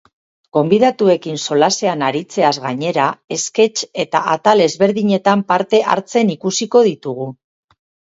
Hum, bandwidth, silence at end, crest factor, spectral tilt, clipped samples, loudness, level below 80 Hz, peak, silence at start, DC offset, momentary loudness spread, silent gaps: none; 8 kHz; 0.8 s; 16 dB; -4.5 dB/octave; under 0.1%; -15 LUFS; -64 dBFS; 0 dBFS; 0.55 s; under 0.1%; 7 LU; 3.24-3.28 s